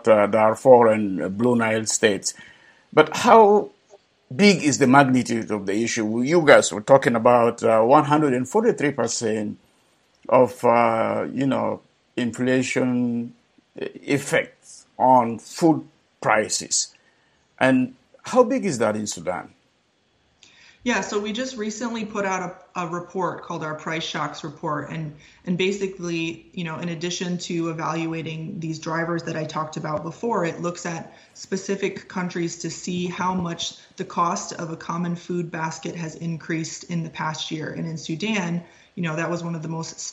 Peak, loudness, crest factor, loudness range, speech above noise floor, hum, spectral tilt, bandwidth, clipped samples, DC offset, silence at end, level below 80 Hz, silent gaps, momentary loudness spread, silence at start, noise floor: 0 dBFS; -22 LUFS; 22 dB; 10 LU; 43 dB; none; -4.5 dB/octave; 14.5 kHz; under 0.1%; under 0.1%; 0 s; -64 dBFS; none; 15 LU; 0.05 s; -65 dBFS